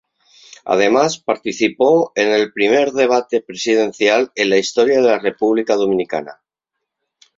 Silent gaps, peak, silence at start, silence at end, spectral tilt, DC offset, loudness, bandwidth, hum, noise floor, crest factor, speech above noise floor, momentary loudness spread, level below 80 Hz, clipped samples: none; 0 dBFS; 0.65 s; 1.05 s; -4 dB/octave; under 0.1%; -16 LUFS; 7.8 kHz; none; -79 dBFS; 16 dB; 64 dB; 7 LU; -60 dBFS; under 0.1%